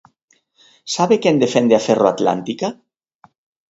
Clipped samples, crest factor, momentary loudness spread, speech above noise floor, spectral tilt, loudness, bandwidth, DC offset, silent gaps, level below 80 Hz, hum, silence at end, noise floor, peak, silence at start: under 0.1%; 18 dB; 11 LU; 46 dB; -5 dB/octave; -17 LUFS; 8 kHz; under 0.1%; none; -62 dBFS; none; 0.95 s; -62 dBFS; 0 dBFS; 0.85 s